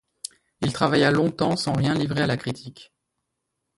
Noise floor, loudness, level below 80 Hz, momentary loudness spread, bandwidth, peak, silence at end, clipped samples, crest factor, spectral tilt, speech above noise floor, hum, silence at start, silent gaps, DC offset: -80 dBFS; -23 LUFS; -54 dBFS; 19 LU; 11.5 kHz; -4 dBFS; 0.95 s; under 0.1%; 20 dB; -5.5 dB/octave; 57 dB; none; 0.6 s; none; under 0.1%